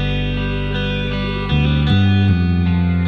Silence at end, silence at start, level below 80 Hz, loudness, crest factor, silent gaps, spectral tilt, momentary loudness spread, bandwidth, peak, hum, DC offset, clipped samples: 0 s; 0 s; -26 dBFS; -17 LUFS; 12 dB; none; -8.5 dB/octave; 6 LU; 6 kHz; -4 dBFS; none; under 0.1%; under 0.1%